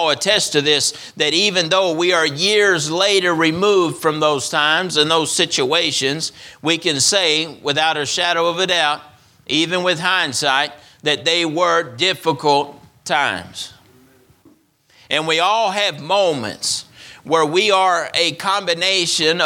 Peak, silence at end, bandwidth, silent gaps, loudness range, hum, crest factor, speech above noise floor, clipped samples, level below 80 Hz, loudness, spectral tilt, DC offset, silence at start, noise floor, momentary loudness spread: 0 dBFS; 0 s; 17.5 kHz; none; 5 LU; none; 18 dB; 37 dB; under 0.1%; -62 dBFS; -16 LUFS; -2 dB/octave; under 0.1%; 0 s; -54 dBFS; 7 LU